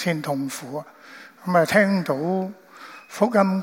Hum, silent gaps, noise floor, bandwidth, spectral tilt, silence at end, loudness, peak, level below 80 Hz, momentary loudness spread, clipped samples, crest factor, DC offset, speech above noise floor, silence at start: none; none; -44 dBFS; 16.5 kHz; -6 dB/octave; 0 s; -22 LUFS; -4 dBFS; -70 dBFS; 24 LU; under 0.1%; 20 dB; under 0.1%; 21 dB; 0 s